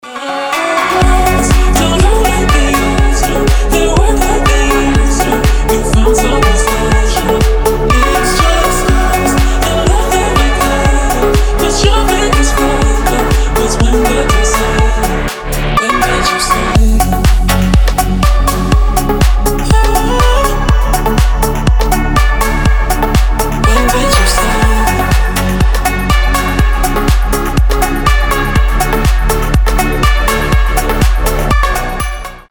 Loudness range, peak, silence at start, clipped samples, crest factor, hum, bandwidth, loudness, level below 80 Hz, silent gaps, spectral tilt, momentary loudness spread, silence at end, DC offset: 2 LU; 0 dBFS; 0.05 s; under 0.1%; 10 dB; none; over 20 kHz; -11 LUFS; -12 dBFS; none; -4.5 dB/octave; 3 LU; 0.1 s; under 0.1%